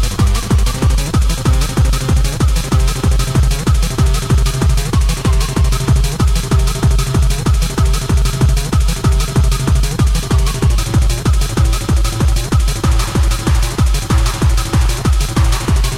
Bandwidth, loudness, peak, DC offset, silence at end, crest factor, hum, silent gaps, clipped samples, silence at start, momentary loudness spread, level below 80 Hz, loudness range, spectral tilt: 16 kHz; -15 LUFS; -2 dBFS; under 0.1%; 0 s; 10 dB; none; none; under 0.1%; 0 s; 2 LU; -14 dBFS; 0 LU; -5 dB/octave